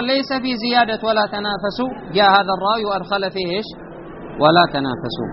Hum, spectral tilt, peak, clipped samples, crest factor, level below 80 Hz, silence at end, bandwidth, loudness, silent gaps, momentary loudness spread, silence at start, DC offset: none; -2.5 dB/octave; 0 dBFS; under 0.1%; 18 dB; -48 dBFS; 0 s; 6 kHz; -18 LUFS; none; 13 LU; 0 s; under 0.1%